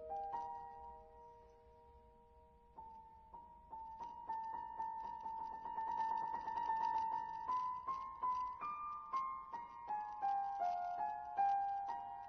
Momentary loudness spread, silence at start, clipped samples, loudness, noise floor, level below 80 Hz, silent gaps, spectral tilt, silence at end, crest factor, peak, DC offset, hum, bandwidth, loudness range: 19 LU; 0 s; under 0.1%; -43 LUFS; -66 dBFS; -72 dBFS; none; -2.5 dB/octave; 0 s; 16 dB; -28 dBFS; under 0.1%; none; 6.4 kHz; 14 LU